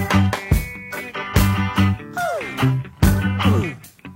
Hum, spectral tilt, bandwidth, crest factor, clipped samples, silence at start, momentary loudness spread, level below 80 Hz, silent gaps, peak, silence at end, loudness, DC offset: none; -6 dB/octave; 16.5 kHz; 18 dB; under 0.1%; 0 s; 10 LU; -30 dBFS; none; 0 dBFS; 0 s; -20 LUFS; under 0.1%